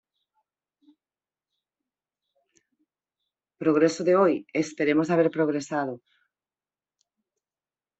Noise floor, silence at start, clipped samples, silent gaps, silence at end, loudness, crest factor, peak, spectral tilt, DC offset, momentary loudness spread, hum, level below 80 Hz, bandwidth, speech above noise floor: under -90 dBFS; 3.6 s; under 0.1%; none; 2 s; -24 LUFS; 20 dB; -8 dBFS; -6 dB/octave; under 0.1%; 9 LU; none; -74 dBFS; 8.2 kHz; over 67 dB